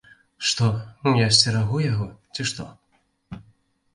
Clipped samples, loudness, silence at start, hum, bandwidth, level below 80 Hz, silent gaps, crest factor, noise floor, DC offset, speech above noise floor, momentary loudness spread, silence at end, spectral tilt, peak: under 0.1%; -22 LUFS; 0.4 s; none; 11.5 kHz; -52 dBFS; none; 22 dB; -61 dBFS; under 0.1%; 39 dB; 25 LU; 0.55 s; -4 dB/octave; -2 dBFS